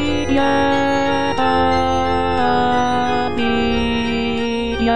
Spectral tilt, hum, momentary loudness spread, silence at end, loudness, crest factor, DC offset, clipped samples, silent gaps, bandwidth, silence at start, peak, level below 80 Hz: -5.5 dB/octave; none; 3 LU; 0 s; -17 LUFS; 12 dB; 4%; under 0.1%; none; 10.5 kHz; 0 s; -4 dBFS; -34 dBFS